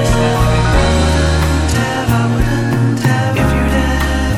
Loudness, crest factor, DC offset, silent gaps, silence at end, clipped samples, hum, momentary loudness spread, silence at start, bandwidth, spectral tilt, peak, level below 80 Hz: -14 LUFS; 12 dB; under 0.1%; none; 0 s; under 0.1%; none; 3 LU; 0 s; 16 kHz; -6 dB/octave; -2 dBFS; -18 dBFS